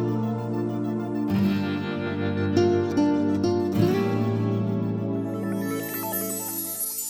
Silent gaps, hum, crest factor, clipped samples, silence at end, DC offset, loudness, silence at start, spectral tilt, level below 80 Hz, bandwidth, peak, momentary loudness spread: none; none; 16 dB; under 0.1%; 0 s; under 0.1%; -25 LUFS; 0 s; -6 dB/octave; -58 dBFS; over 20 kHz; -8 dBFS; 6 LU